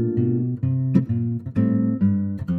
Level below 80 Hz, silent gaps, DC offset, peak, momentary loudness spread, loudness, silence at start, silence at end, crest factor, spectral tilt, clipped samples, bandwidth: -52 dBFS; none; under 0.1%; -4 dBFS; 4 LU; -22 LUFS; 0 s; 0 s; 16 dB; -12 dB/octave; under 0.1%; 3.3 kHz